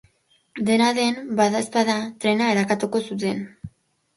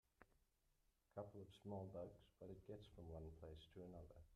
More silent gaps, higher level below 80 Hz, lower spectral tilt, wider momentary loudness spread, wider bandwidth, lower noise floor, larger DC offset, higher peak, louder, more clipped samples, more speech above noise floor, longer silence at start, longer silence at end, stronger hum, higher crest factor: neither; first, -60 dBFS vs -72 dBFS; second, -4.5 dB/octave vs -8 dB/octave; first, 16 LU vs 7 LU; second, 11.5 kHz vs 13 kHz; second, -63 dBFS vs -84 dBFS; neither; first, -6 dBFS vs -40 dBFS; first, -22 LUFS vs -59 LUFS; neither; first, 41 dB vs 26 dB; first, 0.55 s vs 0.2 s; first, 0.5 s vs 0 s; neither; about the same, 16 dB vs 20 dB